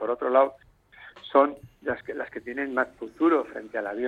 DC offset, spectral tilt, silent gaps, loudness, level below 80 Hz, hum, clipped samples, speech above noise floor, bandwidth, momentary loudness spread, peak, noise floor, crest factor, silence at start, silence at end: under 0.1%; -6.5 dB/octave; none; -26 LUFS; -64 dBFS; none; under 0.1%; 25 dB; 4.8 kHz; 12 LU; -6 dBFS; -51 dBFS; 20 dB; 0 s; 0 s